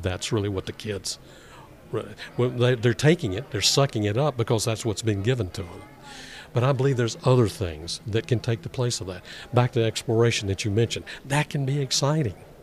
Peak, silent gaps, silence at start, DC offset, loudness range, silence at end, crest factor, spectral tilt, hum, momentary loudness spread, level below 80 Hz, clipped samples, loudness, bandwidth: -4 dBFS; none; 0 s; under 0.1%; 3 LU; 0 s; 20 dB; -5 dB/octave; none; 12 LU; -52 dBFS; under 0.1%; -25 LUFS; 14.5 kHz